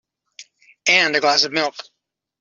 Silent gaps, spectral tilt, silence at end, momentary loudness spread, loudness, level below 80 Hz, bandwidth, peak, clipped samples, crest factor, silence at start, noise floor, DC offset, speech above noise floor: none; -1 dB/octave; 0.6 s; 11 LU; -17 LUFS; -70 dBFS; 7.6 kHz; -2 dBFS; under 0.1%; 20 dB; 0.4 s; -46 dBFS; under 0.1%; 28 dB